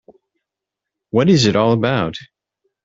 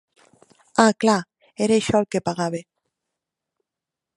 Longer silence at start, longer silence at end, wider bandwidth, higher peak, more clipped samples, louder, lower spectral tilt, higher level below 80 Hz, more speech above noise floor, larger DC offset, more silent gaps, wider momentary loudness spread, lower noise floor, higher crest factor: first, 1.15 s vs 0.75 s; second, 0.6 s vs 1.55 s; second, 8 kHz vs 11.5 kHz; about the same, -2 dBFS vs 0 dBFS; neither; first, -16 LUFS vs -21 LUFS; about the same, -6 dB/octave vs -5 dB/octave; first, -52 dBFS vs -58 dBFS; about the same, 69 dB vs 67 dB; neither; neither; about the same, 11 LU vs 10 LU; about the same, -84 dBFS vs -87 dBFS; second, 16 dB vs 24 dB